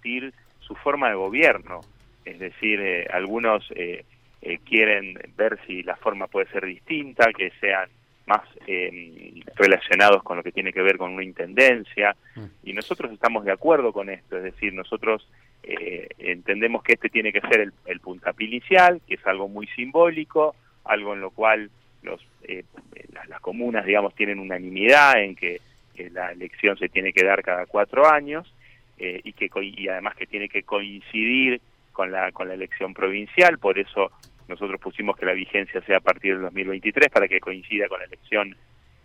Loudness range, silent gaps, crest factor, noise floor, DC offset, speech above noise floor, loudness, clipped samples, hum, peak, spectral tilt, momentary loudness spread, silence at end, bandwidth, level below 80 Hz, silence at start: 5 LU; none; 20 dB; -43 dBFS; under 0.1%; 20 dB; -22 LUFS; under 0.1%; none; -4 dBFS; -4.5 dB/octave; 17 LU; 0.5 s; 15 kHz; -60 dBFS; 0.05 s